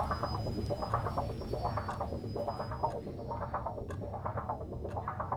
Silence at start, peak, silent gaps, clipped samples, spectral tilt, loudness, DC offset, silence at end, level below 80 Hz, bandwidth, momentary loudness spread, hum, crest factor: 0 s; -18 dBFS; none; under 0.1%; -7.5 dB/octave; -38 LUFS; under 0.1%; 0 s; -48 dBFS; 19.5 kHz; 6 LU; none; 18 dB